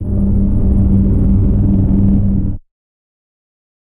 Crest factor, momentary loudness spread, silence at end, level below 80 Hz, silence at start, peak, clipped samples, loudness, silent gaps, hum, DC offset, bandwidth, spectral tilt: 10 dB; 5 LU; 1.3 s; -18 dBFS; 0 s; -2 dBFS; under 0.1%; -14 LUFS; none; none; under 0.1%; 2 kHz; -13 dB/octave